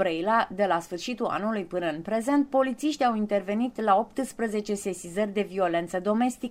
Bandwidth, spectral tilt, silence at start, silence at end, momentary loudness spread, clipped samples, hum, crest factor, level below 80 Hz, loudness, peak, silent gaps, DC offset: 16 kHz; -5 dB/octave; 0 s; 0 s; 6 LU; under 0.1%; none; 18 dB; -62 dBFS; -27 LUFS; -10 dBFS; none; under 0.1%